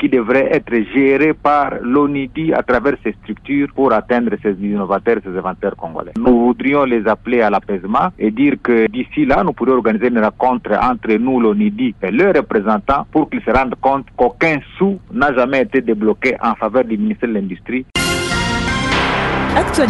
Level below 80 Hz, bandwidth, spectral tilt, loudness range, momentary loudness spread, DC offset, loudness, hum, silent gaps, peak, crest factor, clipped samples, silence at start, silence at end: -36 dBFS; 11.5 kHz; -6 dB/octave; 2 LU; 6 LU; under 0.1%; -15 LUFS; none; none; -2 dBFS; 12 dB; under 0.1%; 0 s; 0 s